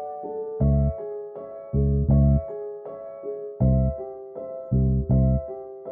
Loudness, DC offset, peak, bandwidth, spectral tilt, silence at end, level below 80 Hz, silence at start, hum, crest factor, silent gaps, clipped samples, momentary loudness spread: -24 LUFS; under 0.1%; -10 dBFS; 2.1 kHz; -16 dB/octave; 0 s; -30 dBFS; 0 s; none; 14 dB; none; under 0.1%; 16 LU